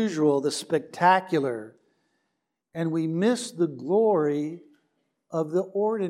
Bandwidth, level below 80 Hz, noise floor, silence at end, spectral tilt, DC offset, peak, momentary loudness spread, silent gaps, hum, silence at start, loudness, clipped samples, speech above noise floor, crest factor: 13 kHz; -84 dBFS; -80 dBFS; 0 s; -5.5 dB/octave; under 0.1%; -6 dBFS; 12 LU; none; none; 0 s; -25 LUFS; under 0.1%; 55 dB; 20 dB